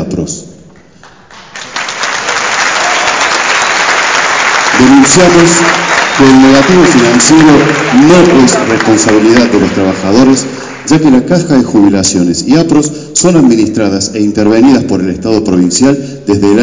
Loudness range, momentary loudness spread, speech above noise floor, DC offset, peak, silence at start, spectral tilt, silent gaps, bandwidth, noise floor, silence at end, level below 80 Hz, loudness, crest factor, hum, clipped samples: 5 LU; 9 LU; 32 dB; 0.7%; 0 dBFS; 0 s; -4 dB/octave; none; 8 kHz; -37 dBFS; 0 s; -36 dBFS; -6 LUFS; 6 dB; none; 4%